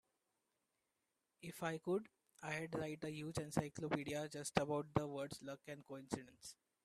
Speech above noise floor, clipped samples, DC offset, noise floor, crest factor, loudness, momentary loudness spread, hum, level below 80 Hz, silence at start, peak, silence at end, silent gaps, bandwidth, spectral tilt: 44 dB; under 0.1%; under 0.1%; -89 dBFS; 28 dB; -45 LUFS; 13 LU; none; -72 dBFS; 1.4 s; -18 dBFS; 0.3 s; none; 15 kHz; -5 dB/octave